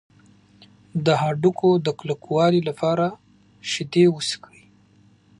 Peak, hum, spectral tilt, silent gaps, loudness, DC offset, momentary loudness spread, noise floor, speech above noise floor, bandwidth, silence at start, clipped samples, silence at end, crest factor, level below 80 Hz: -4 dBFS; 50 Hz at -55 dBFS; -6 dB/octave; none; -21 LUFS; under 0.1%; 10 LU; -56 dBFS; 35 dB; 11 kHz; 0.95 s; under 0.1%; 1.05 s; 18 dB; -66 dBFS